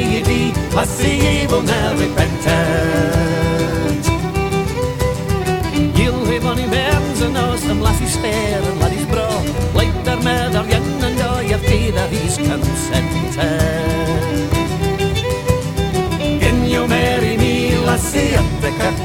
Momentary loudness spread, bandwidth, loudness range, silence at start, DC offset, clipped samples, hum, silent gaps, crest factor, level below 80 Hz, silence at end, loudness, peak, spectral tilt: 3 LU; 17.5 kHz; 2 LU; 0 s; under 0.1%; under 0.1%; none; none; 16 dB; -26 dBFS; 0 s; -17 LUFS; 0 dBFS; -5.5 dB/octave